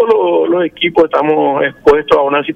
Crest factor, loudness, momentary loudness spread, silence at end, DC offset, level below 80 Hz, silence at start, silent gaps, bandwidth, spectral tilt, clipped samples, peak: 10 dB; -12 LUFS; 3 LU; 0 s; under 0.1%; -42 dBFS; 0 s; none; 7 kHz; -6.5 dB/octave; under 0.1%; 0 dBFS